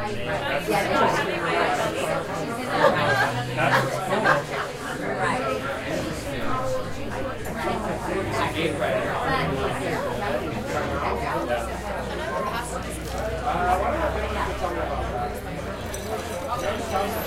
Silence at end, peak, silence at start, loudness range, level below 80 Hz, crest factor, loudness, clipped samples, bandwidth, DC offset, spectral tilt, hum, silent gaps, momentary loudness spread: 0 s; -4 dBFS; 0 s; 5 LU; -40 dBFS; 20 dB; -25 LUFS; under 0.1%; 16 kHz; under 0.1%; -5 dB/octave; none; none; 9 LU